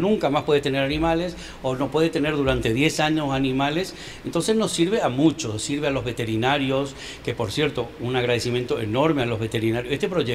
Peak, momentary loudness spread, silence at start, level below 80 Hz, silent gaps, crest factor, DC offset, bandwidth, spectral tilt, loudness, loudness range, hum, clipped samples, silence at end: -6 dBFS; 7 LU; 0 s; -44 dBFS; none; 16 dB; 0.1%; 15.5 kHz; -5 dB/octave; -23 LUFS; 2 LU; none; under 0.1%; 0 s